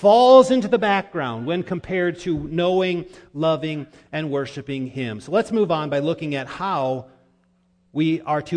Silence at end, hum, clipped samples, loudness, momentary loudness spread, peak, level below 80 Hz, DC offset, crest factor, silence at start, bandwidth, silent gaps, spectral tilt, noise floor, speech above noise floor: 0 s; none; under 0.1%; -21 LUFS; 12 LU; -2 dBFS; -54 dBFS; under 0.1%; 20 dB; 0 s; 10 kHz; none; -6.5 dB/octave; -62 dBFS; 42 dB